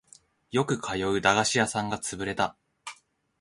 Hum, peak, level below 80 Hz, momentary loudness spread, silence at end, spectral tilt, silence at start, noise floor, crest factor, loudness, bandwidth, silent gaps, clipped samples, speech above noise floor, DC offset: none; -8 dBFS; -58 dBFS; 21 LU; 0.5 s; -3.5 dB/octave; 0.5 s; -58 dBFS; 22 dB; -27 LUFS; 11.5 kHz; none; under 0.1%; 32 dB; under 0.1%